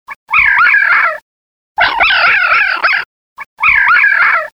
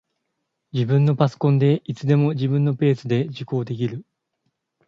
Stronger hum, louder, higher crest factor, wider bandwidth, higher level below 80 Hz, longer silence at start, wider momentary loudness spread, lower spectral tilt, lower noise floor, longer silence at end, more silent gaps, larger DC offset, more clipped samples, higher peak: neither; first, -9 LUFS vs -21 LUFS; second, 10 dB vs 18 dB; first, 16.5 kHz vs 7 kHz; first, -44 dBFS vs -62 dBFS; second, 0.1 s vs 0.75 s; about the same, 8 LU vs 9 LU; second, -2 dB/octave vs -9 dB/octave; first, under -90 dBFS vs -77 dBFS; second, 0.05 s vs 0.85 s; first, 0.16-0.27 s, 1.22-1.75 s, 3.05-3.36 s, 3.46-3.57 s vs none; neither; neither; first, 0 dBFS vs -4 dBFS